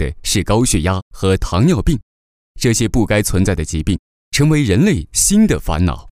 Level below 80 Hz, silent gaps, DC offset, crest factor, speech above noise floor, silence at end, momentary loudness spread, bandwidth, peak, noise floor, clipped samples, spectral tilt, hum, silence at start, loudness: -26 dBFS; 1.02-1.11 s, 2.03-2.55 s, 3.99-4.32 s; under 0.1%; 12 dB; over 75 dB; 0.1 s; 7 LU; 16 kHz; -2 dBFS; under -90 dBFS; under 0.1%; -5 dB/octave; none; 0 s; -16 LUFS